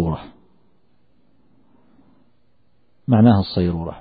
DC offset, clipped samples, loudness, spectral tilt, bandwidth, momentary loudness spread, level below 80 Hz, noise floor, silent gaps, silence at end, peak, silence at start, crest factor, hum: 0.2%; under 0.1%; -18 LUFS; -12.5 dB/octave; 4.9 kHz; 17 LU; -44 dBFS; -64 dBFS; none; 0 s; -2 dBFS; 0 s; 20 dB; none